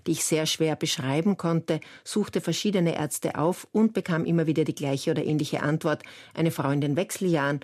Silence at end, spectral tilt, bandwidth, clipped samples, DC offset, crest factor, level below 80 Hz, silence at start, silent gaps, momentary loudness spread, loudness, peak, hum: 0.05 s; -5 dB/octave; 14 kHz; under 0.1%; under 0.1%; 14 dB; -68 dBFS; 0.05 s; none; 4 LU; -26 LUFS; -12 dBFS; none